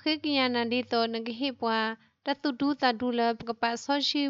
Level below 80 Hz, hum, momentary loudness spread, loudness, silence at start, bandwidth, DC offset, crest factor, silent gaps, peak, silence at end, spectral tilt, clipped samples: -72 dBFS; none; 6 LU; -29 LUFS; 0.05 s; 7.8 kHz; under 0.1%; 18 dB; none; -10 dBFS; 0 s; -3.5 dB/octave; under 0.1%